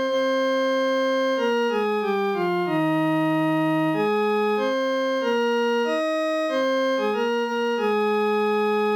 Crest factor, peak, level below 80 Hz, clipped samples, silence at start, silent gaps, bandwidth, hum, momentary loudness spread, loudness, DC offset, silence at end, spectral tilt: 10 dB; -12 dBFS; -76 dBFS; under 0.1%; 0 s; none; over 20 kHz; none; 2 LU; -23 LUFS; under 0.1%; 0 s; -5.5 dB/octave